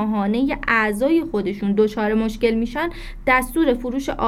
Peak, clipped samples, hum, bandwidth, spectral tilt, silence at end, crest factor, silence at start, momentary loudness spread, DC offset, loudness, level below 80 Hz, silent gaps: -4 dBFS; under 0.1%; none; 16 kHz; -6 dB/octave; 0 s; 16 dB; 0 s; 7 LU; under 0.1%; -20 LUFS; -38 dBFS; none